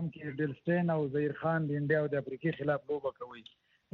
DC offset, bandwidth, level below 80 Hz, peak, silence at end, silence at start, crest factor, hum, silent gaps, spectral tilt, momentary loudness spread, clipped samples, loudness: under 0.1%; 4.5 kHz; -70 dBFS; -16 dBFS; 0.5 s; 0 s; 16 dB; none; none; -7 dB/octave; 9 LU; under 0.1%; -33 LUFS